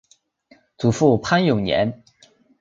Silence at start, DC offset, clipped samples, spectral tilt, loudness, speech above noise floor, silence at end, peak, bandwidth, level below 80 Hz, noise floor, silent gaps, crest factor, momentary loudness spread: 0.8 s; under 0.1%; under 0.1%; -6 dB/octave; -19 LUFS; 38 dB; 0.65 s; -2 dBFS; 7.8 kHz; -50 dBFS; -56 dBFS; none; 20 dB; 6 LU